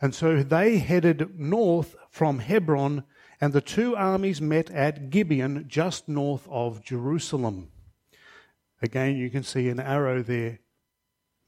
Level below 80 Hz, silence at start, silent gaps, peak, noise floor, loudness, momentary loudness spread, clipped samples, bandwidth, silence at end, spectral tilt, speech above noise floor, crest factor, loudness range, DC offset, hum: -58 dBFS; 0 s; none; -8 dBFS; -80 dBFS; -26 LUFS; 9 LU; under 0.1%; 15 kHz; 0.9 s; -7 dB/octave; 55 dB; 18 dB; 6 LU; under 0.1%; none